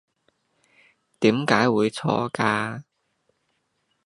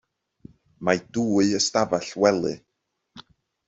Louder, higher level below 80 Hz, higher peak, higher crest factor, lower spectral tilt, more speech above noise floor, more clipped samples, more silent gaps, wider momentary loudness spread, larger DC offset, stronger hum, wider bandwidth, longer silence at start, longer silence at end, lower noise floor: about the same, -22 LUFS vs -23 LUFS; about the same, -66 dBFS vs -62 dBFS; about the same, -2 dBFS vs -4 dBFS; about the same, 24 dB vs 22 dB; first, -5.5 dB/octave vs -4 dB/octave; second, 51 dB vs 55 dB; neither; neither; about the same, 8 LU vs 9 LU; neither; neither; first, 11.5 kHz vs 8.2 kHz; first, 1.2 s vs 0.8 s; first, 1.25 s vs 0.5 s; second, -73 dBFS vs -77 dBFS